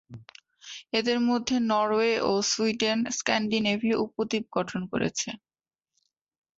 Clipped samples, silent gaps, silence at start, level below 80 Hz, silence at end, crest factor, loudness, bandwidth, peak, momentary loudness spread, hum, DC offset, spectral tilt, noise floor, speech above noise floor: under 0.1%; none; 0.1 s; -64 dBFS; 1.2 s; 18 dB; -26 LUFS; 8 kHz; -10 dBFS; 10 LU; none; under 0.1%; -3.5 dB/octave; -81 dBFS; 55 dB